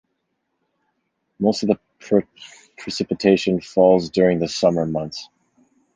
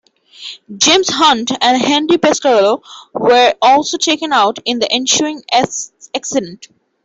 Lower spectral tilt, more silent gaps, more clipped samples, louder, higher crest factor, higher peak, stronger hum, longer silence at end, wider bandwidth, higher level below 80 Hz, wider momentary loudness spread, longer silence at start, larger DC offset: first, -6 dB/octave vs -2 dB/octave; neither; neither; second, -20 LUFS vs -12 LUFS; first, 20 dB vs 14 dB; about the same, -2 dBFS vs 0 dBFS; neither; first, 0.7 s vs 0.5 s; first, 9.8 kHz vs 8.4 kHz; about the same, -56 dBFS vs -58 dBFS; about the same, 14 LU vs 14 LU; first, 1.4 s vs 0.4 s; neither